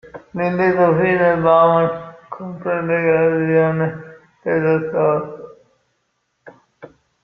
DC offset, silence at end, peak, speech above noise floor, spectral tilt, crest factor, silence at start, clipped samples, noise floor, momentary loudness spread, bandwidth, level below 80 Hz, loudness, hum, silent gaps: under 0.1%; 0.35 s; -2 dBFS; 53 dB; -9.5 dB/octave; 16 dB; 0.15 s; under 0.1%; -69 dBFS; 18 LU; 5.8 kHz; -56 dBFS; -17 LUFS; none; none